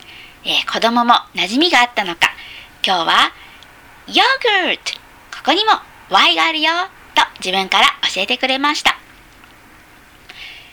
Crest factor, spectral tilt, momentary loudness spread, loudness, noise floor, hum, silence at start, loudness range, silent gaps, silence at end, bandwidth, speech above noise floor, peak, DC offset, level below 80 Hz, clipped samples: 18 dB; -1.5 dB/octave; 14 LU; -15 LUFS; -45 dBFS; none; 0.1 s; 2 LU; none; 0.15 s; over 20 kHz; 29 dB; 0 dBFS; under 0.1%; -52 dBFS; under 0.1%